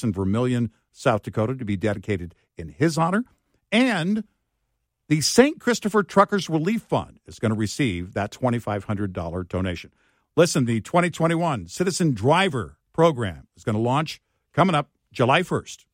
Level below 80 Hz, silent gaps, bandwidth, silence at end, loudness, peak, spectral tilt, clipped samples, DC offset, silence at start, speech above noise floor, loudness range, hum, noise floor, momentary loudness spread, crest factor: -54 dBFS; none; 16 kHz; 0.2 s; -23 LUFS; -2 dBFS; -5.5 dB/octave; under 0.1%; under 0.1%; 0 s; 53 dB; 4 LU; none; -76 dBFS; 11 LU; 22 dB